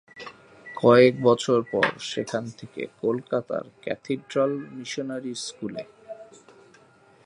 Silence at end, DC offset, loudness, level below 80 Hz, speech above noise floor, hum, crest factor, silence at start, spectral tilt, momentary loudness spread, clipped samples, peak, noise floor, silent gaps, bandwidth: 1 s; under 0.1%; -24 LUFS; -68 dBFS; 32 dB; none; 22 dB; 0.15 s; -5.5 dB/octave; 23 LU; under 0.1%; -4 dBFS; -56 dBFS; none; 11 kHz